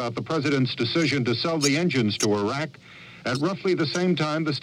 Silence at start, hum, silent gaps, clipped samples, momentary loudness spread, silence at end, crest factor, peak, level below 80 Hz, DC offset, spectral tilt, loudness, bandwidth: 0 s; none; none; under 0.1%; 7 LU; 0 s; 16 dB; -10 dBFS; -64 dBFS; under 0.1%; -5 dB/octave; -24 LUFS; 16 kHz